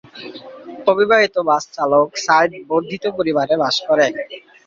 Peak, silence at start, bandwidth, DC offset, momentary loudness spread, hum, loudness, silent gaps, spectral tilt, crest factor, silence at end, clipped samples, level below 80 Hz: -2 dBFS; 0.15 s; 7.6 kHz; under 0.1%; 20 LU; none; -17 LUFS; none; -3.5 dB/octave; 16 dB; 0.3 s; under 0.1%; -62 dBFS